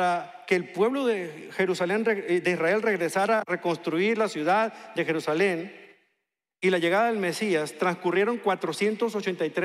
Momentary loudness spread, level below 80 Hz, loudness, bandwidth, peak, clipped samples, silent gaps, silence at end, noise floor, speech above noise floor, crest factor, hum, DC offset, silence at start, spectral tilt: 5 LU; -84 dBFS; -26 LUFS; 14.5 kHz; -8 dBFS; under 0.1%; none; 0 s; -82 dBFS; 56 dB; 16 dB; none; under 0.1%; 0 s; -5 dB/octave